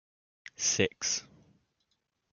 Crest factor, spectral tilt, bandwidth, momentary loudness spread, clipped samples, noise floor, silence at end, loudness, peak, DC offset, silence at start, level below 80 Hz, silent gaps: 24 dB; -1.5 dB/octave; 11 kHz; 9 LU; under 0.1%; -80 dBFS; 1.15 s; -30 LUFS; -12 dBFS; under 0.1%; 0.6 s; -72 dBFS; none